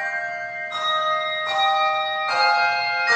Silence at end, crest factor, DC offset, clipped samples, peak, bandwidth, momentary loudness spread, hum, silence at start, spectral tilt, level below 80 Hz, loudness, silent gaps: 0 s; 14 dB; under 0.1%; under 0.1%; -8 dBFS; 9 kHz; 9 LU; none; 0 s; -0.5 dB/octave; -70 dBFS; -21 LUFS; none